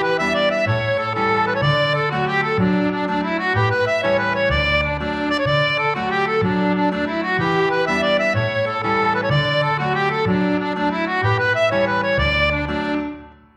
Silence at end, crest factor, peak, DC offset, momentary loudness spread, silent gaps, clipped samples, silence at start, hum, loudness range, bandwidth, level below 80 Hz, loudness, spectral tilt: 0.25 s; 12 dB; -6 dBFS; under 0.1%; 4 LU; none; under 0.1%; 0 s; none; 0 LU; 9.8 kHz; -38 dBFS; -19 LUFS; -6.5 dB/octave